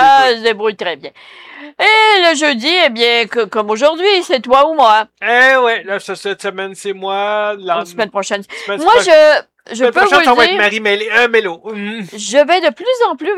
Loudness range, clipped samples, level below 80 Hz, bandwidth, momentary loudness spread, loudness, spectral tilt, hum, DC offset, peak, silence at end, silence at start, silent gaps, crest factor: 4 LU; under 0.1%; -56 dBFS; 15 kHz; 14 LU; -12 LUFS; -2 dB/octave; none; under 0.1%; 0 dBFS; 0 s; 0 s; none; 12 dB